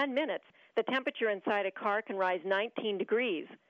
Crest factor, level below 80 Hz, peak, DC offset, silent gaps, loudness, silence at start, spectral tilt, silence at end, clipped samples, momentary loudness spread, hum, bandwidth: 16 dB; under -90 dBFS; -18 dBFS; under 0.1%; none; -33 LUFS; 0 s; -6 dB/octave; 0.15 s; under 0.1%; 4 LU; none; 7 kHz